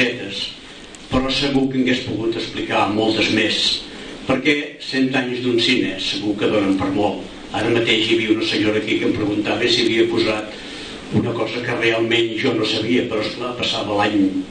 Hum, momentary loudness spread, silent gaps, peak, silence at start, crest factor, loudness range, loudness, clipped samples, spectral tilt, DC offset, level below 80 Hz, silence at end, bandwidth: none; 9 LU; none; -4 dBFS; 0 s; 16 dB; 2 LU; -19 LUFS; under 0.1%; -4.5 dB/octave; under 0.1%; -44 dBFS; 0 s; 9.8 kHz